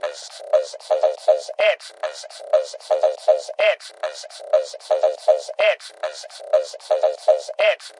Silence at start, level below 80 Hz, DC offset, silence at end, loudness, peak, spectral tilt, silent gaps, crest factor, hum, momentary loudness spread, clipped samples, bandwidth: 0.05 s; -84 dBFS; under 0.1%; 0.1 s; -21 LUFS; -4 dBFS; 1.5 dB/octave; none; 18 dB; none; 12 LU; under 0.1%; 11.5 kHz